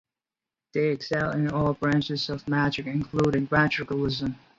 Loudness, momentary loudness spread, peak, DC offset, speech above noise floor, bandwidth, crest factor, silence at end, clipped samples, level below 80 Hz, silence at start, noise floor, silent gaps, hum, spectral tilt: -26 LUFS; 6 LU; -8 dBFS; under 0.1%; over 64 dB; 7.6 kHz; 18 dB; 0.2 s; under 0.1%; -52 dBFS; 0.75 s; under -90 dBFS; none; none; -7 dB/octave